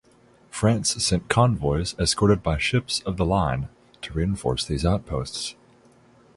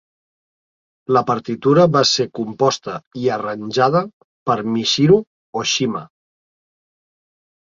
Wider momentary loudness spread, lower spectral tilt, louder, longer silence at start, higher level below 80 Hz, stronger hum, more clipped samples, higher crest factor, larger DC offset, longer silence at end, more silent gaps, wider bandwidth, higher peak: second, 11 LU vs 14 LU; about the same, -5 dB/octave vs -5 dB/octave; second, -24 LUFS vs -17 LUFS; second, 0.55 s vs 1.1 s; first, -38 dBFS vs -60 dBFS; neither; neither; first, 24 dB vs 18 dB; neither; second, 0.85 s vs 1.65 s; second, none vs 3.07-3.11 s, 4.13-4.46 s, 5.27-5.53 s; first, 11.5 kHz vs 7.6 kHz; about the same, 0 dBFS vs -2 dBFS